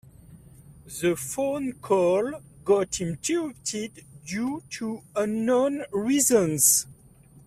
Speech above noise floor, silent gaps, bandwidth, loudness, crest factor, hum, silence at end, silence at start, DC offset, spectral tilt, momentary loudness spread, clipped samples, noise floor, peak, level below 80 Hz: 28 dB; none; 16 kHz; -25 LUFS; 22 dB; none; 0.55 s; 0.3 s; under 0.1%; -3.5 dB/octave; 15 LU; under 0.1%; -53 dBFS; -4 dBFS; -60 dBFS